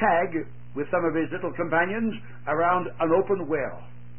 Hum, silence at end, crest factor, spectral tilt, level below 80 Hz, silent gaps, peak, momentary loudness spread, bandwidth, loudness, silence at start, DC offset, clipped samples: none; 0 s; 18 dB; -11 dB/octave; -56 dBFS; none; -8 dBFS; 11 LU; 3.3 kHz; -26 LUFS; 0 s; 1%; under 0.1%